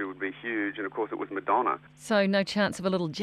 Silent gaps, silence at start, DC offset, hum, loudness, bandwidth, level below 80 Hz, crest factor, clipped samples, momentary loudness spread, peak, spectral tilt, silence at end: none; 0 s; under 0.1%; 50 Hz at -60 dBFS; -29 LUFS; 14 kHz; -68 dBFS; 16 dB; under 0.1%; 8 LU; -12 dBFS; -5.5 dB/octave; 0 s